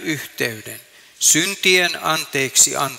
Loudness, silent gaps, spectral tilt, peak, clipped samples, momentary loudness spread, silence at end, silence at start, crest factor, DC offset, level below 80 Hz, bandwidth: -16 LUFS; none; -1 dB/octave; -2 dBFS; under 0.1%; 16 LU; 0 s; 0 s; 18 dB; under 0.1%; -64 dBFS; 16.5 kHz